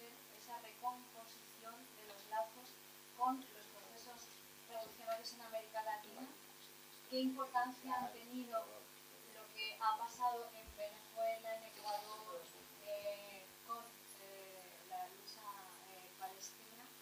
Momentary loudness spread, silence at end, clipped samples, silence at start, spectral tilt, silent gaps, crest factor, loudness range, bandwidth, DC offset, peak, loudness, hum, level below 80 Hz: 15 LU; 0 s; under 0.1%; 0 s; -2 dB/octave; none; 22 dB; 7 LU; over 20 kHz; under 0.1%; -26 dBFS; -47 LUFS; none; -82 dBFS